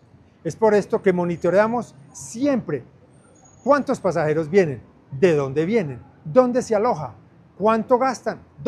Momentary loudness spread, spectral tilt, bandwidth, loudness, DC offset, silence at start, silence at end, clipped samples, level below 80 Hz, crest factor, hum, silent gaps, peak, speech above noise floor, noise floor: 14 LU; -6.5 dB/octave; 12 kHz; -21 LUFS; under 0.1%; 0.45 s; 0 s; under 0.1%; -56 dBFS; 18 dB; none; none; -2 dBFS; 31 dB; -51 dBFS